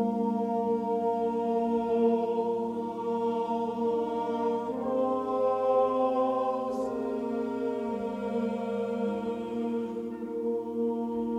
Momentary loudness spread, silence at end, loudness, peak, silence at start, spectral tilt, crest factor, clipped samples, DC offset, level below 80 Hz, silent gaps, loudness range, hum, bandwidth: 7 LU; 0 s; -30 LUFS; -14 dBFS; 0 s; -8 dB/octave; 14 dB; under 0.1%; under 0.1%; -66 dBFS; none; 4 LU; none; 9.2 kHz